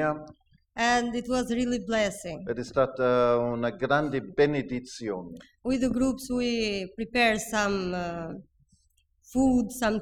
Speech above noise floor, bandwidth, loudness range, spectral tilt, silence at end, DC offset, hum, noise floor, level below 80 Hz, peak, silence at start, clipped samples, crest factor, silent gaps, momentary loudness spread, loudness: 41 dB; 15 kHz; 2 LU; -5 dB/octave; 0 s; under 0.1%; none; -68 dBFS; -50 dBFS; -10 dBFS; 0 s; under 0.1%; 18 dB; none; 12 LU; -27 LUFS